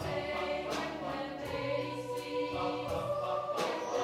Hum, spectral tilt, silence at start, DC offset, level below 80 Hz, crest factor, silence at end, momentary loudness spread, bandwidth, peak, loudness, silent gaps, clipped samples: none; -5 dB/octave; 0 s; under 0.1%; -60 dBFS; 14 dB; 0 s; 4 LU; 16 kHz; -22 dBFS; -36 LUFS; none; under 0.1%